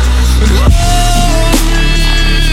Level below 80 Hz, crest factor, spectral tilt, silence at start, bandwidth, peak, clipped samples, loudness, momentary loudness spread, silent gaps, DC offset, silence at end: -8 dBFS; 8 dB; -4 dB/octave; 0 s; 15.5 kHz; 0 dBFS; under 0.1%; -10 LUFS; 2 LU; none; under 0.1%; 0 s